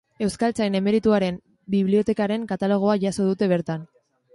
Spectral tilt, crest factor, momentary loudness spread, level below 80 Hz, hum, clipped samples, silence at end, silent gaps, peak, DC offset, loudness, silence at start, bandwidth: -6.5 dB/octave; 16 dB; 8 LU; -56 dBFS; none; under 0.1%; 0.5 s; none; -8 dBFS; under 0.1%; -22 LUFS; 0.2 s; 11.5 kHz